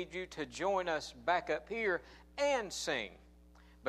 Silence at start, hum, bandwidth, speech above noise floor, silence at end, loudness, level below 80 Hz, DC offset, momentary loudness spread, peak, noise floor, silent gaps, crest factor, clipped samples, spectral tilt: 0 s; none; 15 kHz; 23 dB; 0 s; -36 LUFS; -62 dBFS; under 0.1%; 8 LU; -18 dBFS; -60 dBFS; none; 18 dB; under 0.1%; -3 dB/octave